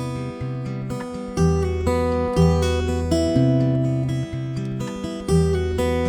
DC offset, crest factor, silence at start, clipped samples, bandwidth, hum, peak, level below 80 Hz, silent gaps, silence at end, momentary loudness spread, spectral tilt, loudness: under 0.1%; 16 dB; 0 s; under 0.1%; 15.5 kHz; none; -4 dBFS; -32 dBFS; none; 0 s; 10 LU; -7 dB/octave; -22 LUFS